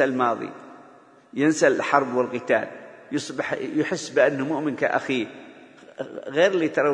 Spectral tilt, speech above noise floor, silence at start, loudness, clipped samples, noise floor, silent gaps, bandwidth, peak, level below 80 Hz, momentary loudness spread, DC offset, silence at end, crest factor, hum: -4.5 dB/octave; 28 dB; 0 s; -23 LUFS; under 0.1%; -51 dBFS; none; 10.5 kHz; -2 dBFS; -72 dBFS; 16 LU; under 0.1%; 0 s; 22 dB; none